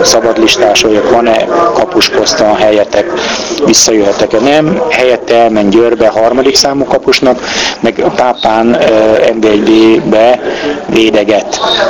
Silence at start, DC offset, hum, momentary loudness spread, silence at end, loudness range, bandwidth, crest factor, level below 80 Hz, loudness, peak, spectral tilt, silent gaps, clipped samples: 0 s; 0.3%; none; 5 LU; 0 s; 1 LU; 20 kHz; 8 dB; -38 dBFS; -8 LUFS; 0 dBFS; -3 dB/octave; none; 1%